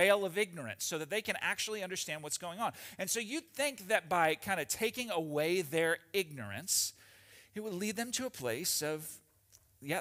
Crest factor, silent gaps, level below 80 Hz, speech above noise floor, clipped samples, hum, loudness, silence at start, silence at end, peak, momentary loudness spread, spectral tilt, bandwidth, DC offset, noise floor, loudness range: 22 dB; none; -76 dBFS; 31 dB; under 0.1%; none; -35 LUFS; 0 s; 0 s; -14 dBFS; 9 LU; -2.5 dB/octave; 16 kHz; under 0.1%; -66 dBFS; 3 LU